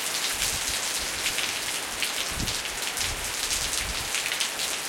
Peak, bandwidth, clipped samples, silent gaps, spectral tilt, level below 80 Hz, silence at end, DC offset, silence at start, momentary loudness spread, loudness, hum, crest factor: -4 dBFS; 17 kHz; under 0.1%; none; 0 dB/octave; -46 dBFS; 0 s; under 0.1%; 0 s; 3 LU; -26 LUFS; none; 24 dB